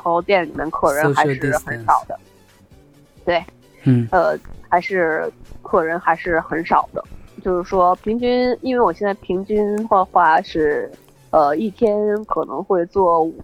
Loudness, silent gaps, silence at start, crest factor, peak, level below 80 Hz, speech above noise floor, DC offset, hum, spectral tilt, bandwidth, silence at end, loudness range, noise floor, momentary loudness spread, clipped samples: -18 LUFS; none; 0.05 s; 16 dB; -2 dBFS; -46 dBFS; 31 dB; under 0.1%; none; -6.5 dB/octave; 17.5 kHz; 0 s; 3 LU; -49 dBFS; 8 LU; under 0.1%